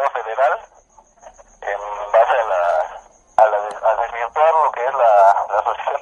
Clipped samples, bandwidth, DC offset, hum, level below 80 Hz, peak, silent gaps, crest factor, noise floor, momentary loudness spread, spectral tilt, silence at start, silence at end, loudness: under 0.1%; 9.8 kHz; under 0.1%; none; -56 dBFS; 0 dBFS; none; 18 dB; -50 dBFS; 12 LU; -2 dB/octave; 0 s; 0 s; -17 LUFS